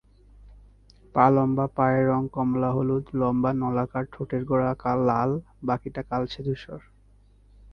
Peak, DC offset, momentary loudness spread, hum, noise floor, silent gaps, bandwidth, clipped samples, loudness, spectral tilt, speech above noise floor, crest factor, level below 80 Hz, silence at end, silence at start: -4 dBFS; under 0.1%; 10 LU; 50 Hz at -50 dBFS; -56 dBFS; none; 6.2 kHz; under 0.1%; -25 LUFS; -9.5 dB/octave; 32 dB; 22 dB; -52 dBFS; 0.95 s; 0.45 s